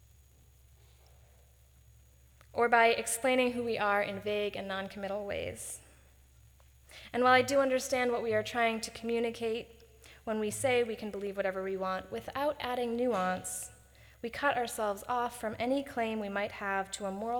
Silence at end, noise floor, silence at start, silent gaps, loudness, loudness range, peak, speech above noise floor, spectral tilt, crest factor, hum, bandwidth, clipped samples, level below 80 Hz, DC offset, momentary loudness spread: 0 s; -61 dBFS; 2.55 s; none; -32 LUFS; 4 LU; -12 dBFS; 29 dB; -3.5 dB/octave; 22 dB; none; over 20 kHz; under 0.1%; -62 dBFS; under 0.1%; 13 LU